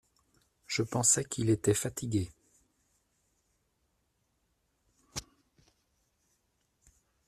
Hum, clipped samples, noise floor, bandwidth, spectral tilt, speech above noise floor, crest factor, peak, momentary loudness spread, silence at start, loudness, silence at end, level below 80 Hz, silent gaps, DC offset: none; under 0.1%; -77 dBFS; 14 kHz; -4 dB/octave; 47 dB; 24 dB; -12 dBFS; 17 LU; 0.7 s; -30 LUFS; 2.05 s; -64 dBFS; none; under 0.1%